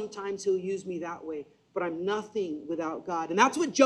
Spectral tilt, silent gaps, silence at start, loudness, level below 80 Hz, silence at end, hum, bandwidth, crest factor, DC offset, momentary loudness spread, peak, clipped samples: -4 dB/octave; none; 0 s; -31 LUFS; -74 dBFS; 0 s; none; 12.5 kHz; 22 dB; under 0.1%; 13 LU; -8 dBFS; under 0.1%